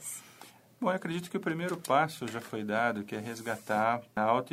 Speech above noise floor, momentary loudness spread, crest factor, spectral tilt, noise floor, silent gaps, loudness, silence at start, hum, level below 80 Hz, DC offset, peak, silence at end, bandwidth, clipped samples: 24 dB; 10 LU; 20 dB; -5 dB/octave; -55 dBFS; none; -32 LUFS; 0 s; none; -72 dBFS; under 0.1%; -12 dBFS; 0 s; 16 kHz; under 0.1%